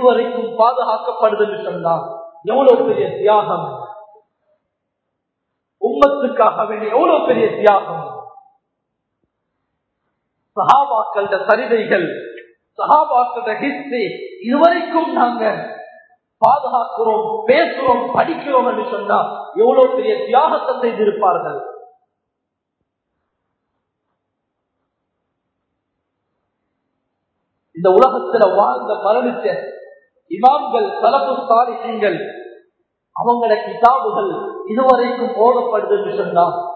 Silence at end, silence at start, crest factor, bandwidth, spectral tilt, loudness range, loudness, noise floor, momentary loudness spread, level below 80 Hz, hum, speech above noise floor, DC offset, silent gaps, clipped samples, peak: 0 s; 0 s; 16 dB; 6.8 kHz; -7 dB/octave; 4 LU; -16 LUFS; -77 dBFS; 12 LU; -62 dBFS; none; 62 dB; under 0.1%; none; under 0.1%; 0 dBFS